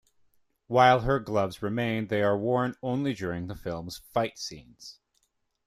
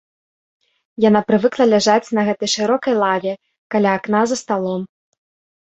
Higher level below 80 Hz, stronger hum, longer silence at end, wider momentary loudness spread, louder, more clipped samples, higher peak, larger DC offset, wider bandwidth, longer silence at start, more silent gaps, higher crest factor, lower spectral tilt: first, -52 dBFS vs -62 dBFS; neither; about the same, 0.75 s vs 0.8 s; first, 17 LU vs 12 LU; second, -27 LUFS vs -17 LUFS; neither; second, -8 dBFS vs -2 dBFS; neither; first, 15 kHz vs 8.2 kHz; second, 0.7 s vs 1 s; second, none vs 3.58-3.70 s; first, 22 dB vs 16 dB; first, -6 dB/octave vs -4.5 dB/octave